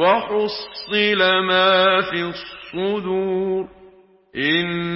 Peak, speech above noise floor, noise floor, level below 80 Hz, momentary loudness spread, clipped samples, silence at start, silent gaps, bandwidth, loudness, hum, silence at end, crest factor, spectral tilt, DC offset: -4 dBFS; 31 dB; -50 dBFS; -56 dBFS; 14 LU; under 0.1%; 0 s; none; 5.8 kHz; -19 LUFS; none; 0 s; 16 dB; -9 dB/octave; under 0.1%